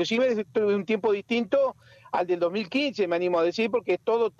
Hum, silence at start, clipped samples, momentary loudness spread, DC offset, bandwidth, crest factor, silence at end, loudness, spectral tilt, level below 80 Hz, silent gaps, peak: none; 0 s; under 0.1%; 3 LU; under 0.1%; 7.6 kHz; 12 dB; 0.1 s; -26 LUFS; -5.5 dB/octave; -72 dBFS; none; -14 dBFS